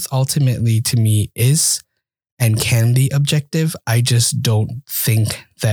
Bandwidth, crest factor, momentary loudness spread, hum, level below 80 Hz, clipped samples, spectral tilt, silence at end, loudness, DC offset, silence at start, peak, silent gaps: over 20 kHz; 16 dB; 6 LU; none; -48 dBFS; under 0.1%; -4.5 dB/octave; 0 s; -16 LUFS; under 0.1%; 0 s; -2 dBFS; 2.32-2.37 s